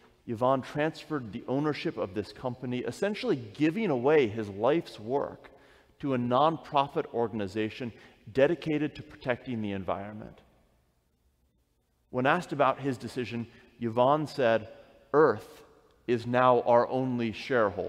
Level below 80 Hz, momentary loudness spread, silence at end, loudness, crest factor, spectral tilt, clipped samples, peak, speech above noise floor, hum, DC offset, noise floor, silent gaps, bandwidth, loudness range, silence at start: -66 dBFS; 13 LU; 0 s; -29 LUFS; 20 dB; -7 dB/octave; under 0.1%; -10 dBFS; 44 dB; none; under 0.1%; -72 dBFS; none; 13.5 kHz; 6 LU; 0.25 s